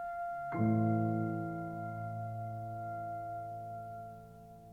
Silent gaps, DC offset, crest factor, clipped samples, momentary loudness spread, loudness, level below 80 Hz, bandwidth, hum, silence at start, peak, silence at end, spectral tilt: none; under 0.1%; 18 dB; under 0.1%; 16 LU; -38 LUFS; -66 dBFS; 2.9 kHz; none; 0 s; -20 dBFS; 0 s; -10.5 dB/octave